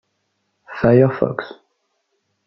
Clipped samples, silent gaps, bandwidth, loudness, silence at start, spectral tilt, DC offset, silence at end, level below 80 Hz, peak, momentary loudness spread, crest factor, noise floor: under 0.1%; none; 5.8 kHz; -17 LUFS; 0.7 s; -10.5 dB/octave; under 0.1%; 0.95 s; -52 dBFS; -2 dBFS; 22 LU; 18 dB; -71 dBFS